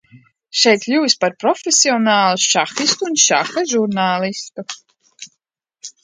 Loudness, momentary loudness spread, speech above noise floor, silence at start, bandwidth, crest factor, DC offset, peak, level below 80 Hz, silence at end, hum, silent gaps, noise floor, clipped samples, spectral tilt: -15 LUFS; 16 LU; 56 dB; 0.55 s; 11 kHz; 18 dB; under 0.1%; 0 dBFS; -70 dBFS; 0.15 s; none; none; -72 dBFS; under 0.1%; -2 dB/octave